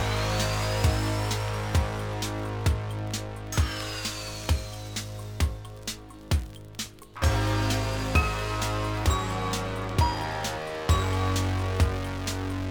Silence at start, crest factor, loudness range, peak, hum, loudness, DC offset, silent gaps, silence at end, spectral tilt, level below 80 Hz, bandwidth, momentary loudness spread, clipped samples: 0 s; 18 dB; 4 LU; -10 dBFS; none; -29 LUFS; under 0.1%; none; 0 s; -4.5 dB/octave; -34 dBFS; over 20 kHz; 9 LU; under 0.1%